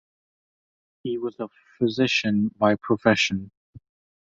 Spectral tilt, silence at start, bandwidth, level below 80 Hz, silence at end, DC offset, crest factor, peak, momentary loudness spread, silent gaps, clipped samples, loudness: -5 dB/octave; 1.05 s; 7.8 kHz; -58 dBFS; 0.45 s; under 0.1%; 22 dB; -4 dBFS; 14 LU; 3.57-3.73 s; under 0.1%; -23 LUFS